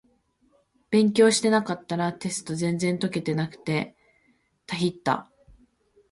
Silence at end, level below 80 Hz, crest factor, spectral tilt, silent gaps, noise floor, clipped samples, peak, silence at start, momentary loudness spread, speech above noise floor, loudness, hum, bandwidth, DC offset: 0.9 s; -64 dBFS; 20 dB; -5 dB/octave; none; -67 dBFS; under 0.1%; -6 dBFS; 0.9 s; 11 LU; 43 dB; -25 LUFS; none; 11.5 kHz; under 0.1%